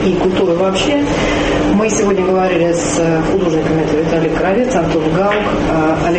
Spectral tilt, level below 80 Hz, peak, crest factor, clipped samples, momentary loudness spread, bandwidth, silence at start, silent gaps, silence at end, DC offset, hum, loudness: -5.5 dB/octave; -32 dBFS; -2 dBFS; 10 dB; under 0.1%; 1 LU; 8.8 kHz; 0 s; none; 0 s; under 0.1%; none; -14 LUFS